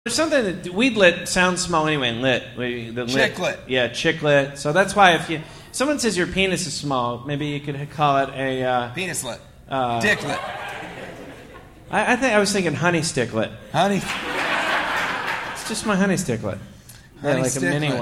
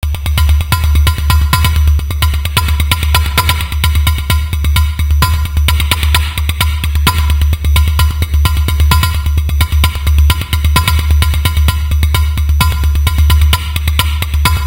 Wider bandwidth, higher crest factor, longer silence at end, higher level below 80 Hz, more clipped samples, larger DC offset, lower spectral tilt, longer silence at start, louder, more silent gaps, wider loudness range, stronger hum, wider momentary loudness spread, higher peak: about the same, 16 kHz vs 17.5 kHz; first, 22 dB vs 10 dB; about the same, 0 s vs 0 s; second, -50 dBFS vs -12 dBFS; second, under 0.1% vs 0.1%; neither; about the same, -4 dB/octave vs -4 dB/octave; about the same, 0.05 s vs 0 s; second, -21 LUFS vs -12 LUFS; neither; first, 4 LU vs 1 LU; neither; first, 11 LU vs 3 LU; about the same, 0 dBFS vs 0 dBFS